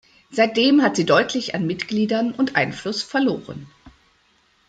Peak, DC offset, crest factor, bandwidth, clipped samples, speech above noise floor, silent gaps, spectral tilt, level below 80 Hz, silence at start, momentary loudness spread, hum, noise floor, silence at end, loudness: -2 dBFS; under 0.1%; 18 dB; 9.2 kHz; under 0.1%; 41 dB; none; -5 dB/octave; -60 dBFS; 0.3 s; 12 LU; none; -61 dBFS; 0.8 s; -20 LUFS